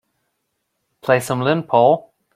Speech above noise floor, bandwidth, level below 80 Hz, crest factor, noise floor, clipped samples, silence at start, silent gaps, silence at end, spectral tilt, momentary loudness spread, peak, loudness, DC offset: 57 dB; 16 kHz; -62 dBFS; 18 dB; -73 dBFS; under 0.1%; 1.05 s; none; 0.35 s; -6 dB/octave; 7 LU; -2 dBFS; -17 LUFS; under 0.1%